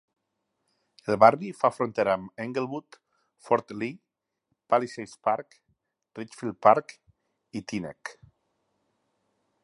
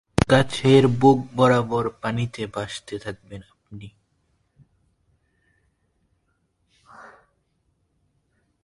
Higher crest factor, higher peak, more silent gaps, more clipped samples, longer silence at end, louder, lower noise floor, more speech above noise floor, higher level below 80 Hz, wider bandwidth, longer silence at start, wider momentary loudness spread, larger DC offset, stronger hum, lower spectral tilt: about the same, 26 dB vs 24 dB; about the same, -2 dBFS vs 0 dBFS; neither; neither; about the same, 1.5 s vs 1.6 s; second, -26 LUFS vs -20 LUFS; first, -80 dBFS vs -70 dBFS; first, 54 dB vs 49 dB; second, -70 dBFS vs -46 dBFS; about the same, 11.5 kHz vs 11.5 kHz; first, 1.05 s vs 0.2 s; second, 20 LU vs 26 LU; neither; neither; about the same, -6 dB/octave vs -6.5 dB/octave